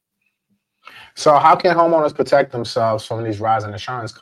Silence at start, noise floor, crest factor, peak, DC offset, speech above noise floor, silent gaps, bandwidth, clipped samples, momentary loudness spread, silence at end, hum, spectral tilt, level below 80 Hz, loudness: 0.95 s; -72 dBFS; 18 dB; 0 dBFS; under 0.1%; 55 dB; none; 12.5 kHz; under 0.1%; 14 LU; 0.1 s; none; -5.5 dB/octave; -60 dBFS; -17 LUFS